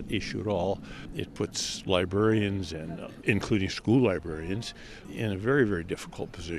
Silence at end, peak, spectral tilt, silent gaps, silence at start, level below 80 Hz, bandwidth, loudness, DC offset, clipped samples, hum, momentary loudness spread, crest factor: 0 s; -8 dBFS; -5.5 dB/octave; none; 0 s; -50 dBFS; 14 kHz; -29 LUFS; under 0.1%; under 0.1%; none; 13 LU; 22 dB